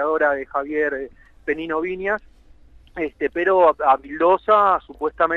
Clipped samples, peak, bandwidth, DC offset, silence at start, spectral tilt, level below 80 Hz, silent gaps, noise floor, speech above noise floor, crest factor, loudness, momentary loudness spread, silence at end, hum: under 0.1%; -4 dBFS; 7 kHz; under 0.1%; 0 s; -7 dB/octave; -50 dBFS; none; -48 dBFS; 28 dB; 18 dB; -20 LUFS; 13 LU; 0 s; none